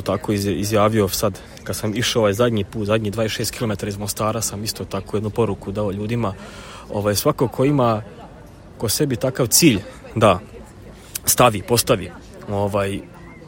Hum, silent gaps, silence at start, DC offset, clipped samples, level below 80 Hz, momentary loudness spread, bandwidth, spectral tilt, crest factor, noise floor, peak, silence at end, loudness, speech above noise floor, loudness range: none; none; 0 s; under 0.1%; under 0.1%; -44 dBFS; 15 LU; 17 kHz; -4.5 dB/octave; 20 dB; -41 dBFS; 0 dBFS; 0 s; -20 LUFS; 21 dB; 5 LU